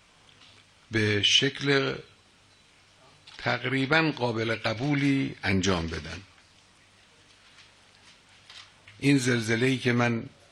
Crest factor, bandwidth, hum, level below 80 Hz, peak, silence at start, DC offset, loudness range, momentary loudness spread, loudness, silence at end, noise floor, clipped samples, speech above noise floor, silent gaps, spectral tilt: 20 dB; 12.5 kHz; none; -60 dBFS; -8 dBFS; 0.9 s; under 0.1%; 7 LU; 18 LU; -26 LUFS; 0.25 s; -59 dBFS; under 0.1%; 33 dB; none; -4.5 dB/octave